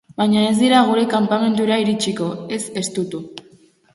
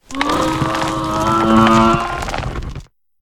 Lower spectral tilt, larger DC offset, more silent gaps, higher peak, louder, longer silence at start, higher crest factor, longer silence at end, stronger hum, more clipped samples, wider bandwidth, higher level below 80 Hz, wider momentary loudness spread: about the same, -4.5 dB/octave vs -5.5 dB/octave; neither; neither; about the same, -2 dBFS vs 0 dBFS; second, -18 LUFS vs -15 LUFS; about the same, 0.2 s vs 0.1 s; about the same, 16 dB vs 16 dB; first, 0.55 s vs 0.35 s; neither; neither; second, 11.5 kHz vs 16 kHz; second, -62 dBFS vs -32 dBFS; second, 12 LU vs 16 LU